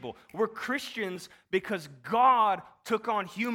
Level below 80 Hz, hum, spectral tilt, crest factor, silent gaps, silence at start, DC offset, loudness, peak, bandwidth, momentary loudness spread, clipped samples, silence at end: -72 dBFS; none; -4.5 dB/octave; 18 dB; none; 0 s; under 0.1%; -29 LUFS; -12 dBFS; 17.5 kHz; 13 LU; under 0.1%; 0 s